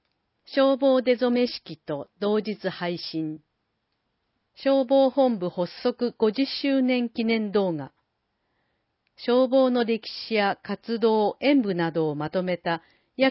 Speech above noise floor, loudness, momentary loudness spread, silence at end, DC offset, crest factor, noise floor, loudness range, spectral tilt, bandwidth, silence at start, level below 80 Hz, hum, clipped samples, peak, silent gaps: 52 dB; -24 LUFS; 11 LU; 0 s; under 0.1%; 18 dB; -76 dBFS; 4 LU; -10 dB/octave; 5.8 kHz; 0.5 s; -70 dBFS; none; under 0.1%; -8 dBFS; none